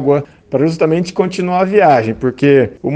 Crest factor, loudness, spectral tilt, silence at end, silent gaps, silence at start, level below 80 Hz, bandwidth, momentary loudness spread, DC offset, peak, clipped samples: 12 dB; -13 LUFS; -7.5 dB/octave; 0 s; none; 0 s; -48 dBFS; 9 kHz; 7 LU; under 0.1%; 0 dBFS; under 0.1%